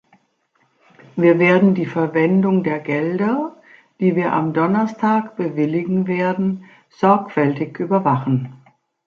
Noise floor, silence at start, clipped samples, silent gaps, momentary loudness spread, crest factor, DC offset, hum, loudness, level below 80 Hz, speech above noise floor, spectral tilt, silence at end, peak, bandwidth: -64 dBFS; 1.15 s; under 0.1%; none; 9 LU; 16 dB; under 0.1%; none; -18 LUFS; -64 dBFS; 46 dB; -9 dB/octave; 0.5 s; -2 dBFS; 6.6 kHz